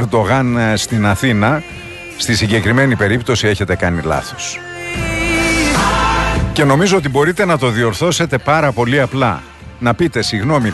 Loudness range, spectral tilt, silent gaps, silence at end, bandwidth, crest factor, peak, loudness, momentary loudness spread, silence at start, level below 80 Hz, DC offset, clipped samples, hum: 2 LU; -5 dB/octave; none; 0 s; 12.5 kHz; 14 dB; 0 dBFS; -14 LUFS; 8 LU; 0 s; -30 dBFS; under 0.1%; under 0.1%; none